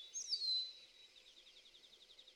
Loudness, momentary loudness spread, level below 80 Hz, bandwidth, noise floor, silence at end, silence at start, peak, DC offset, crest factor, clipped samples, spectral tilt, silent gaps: -39 LUFS; 24 LU; -86 dBFS; 16 kHz; -64 dBFS; 0.05 s; 0 s; -30 dBFS; under 0.1%; 18 dB; under 0.1%; 3.5 dB/octave; none